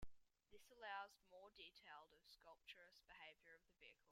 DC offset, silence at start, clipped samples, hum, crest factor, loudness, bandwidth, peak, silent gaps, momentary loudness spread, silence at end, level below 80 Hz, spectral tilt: under 0.1%; 0 s; under 0.1%; none; 22 dB; -61 LUFS; 16 kHz; -40 dBFS; none; 14 LU; 0 s; -76 dBFS; -2.5 dB/octave